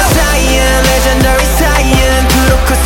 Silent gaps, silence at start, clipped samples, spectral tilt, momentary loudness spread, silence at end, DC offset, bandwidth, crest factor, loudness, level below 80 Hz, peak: none; 0 s; under 0.1%; -4 dB/octave; 1 LU; 0 s; 0.3%; 17.5 kHz; 8 dB; -9 LUFS; -12 dBFS; 0 dBFS